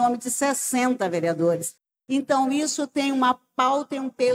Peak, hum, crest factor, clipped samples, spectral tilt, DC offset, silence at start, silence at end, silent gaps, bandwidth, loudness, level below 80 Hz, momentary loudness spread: -8 dBFS; none; 16 dB; under 0.1%; -3.5 dB/octave; under 0.1%; 0 s; 0 s; none; 16.5 kHz; -24 LUFS; -82 dBFS; 6 LU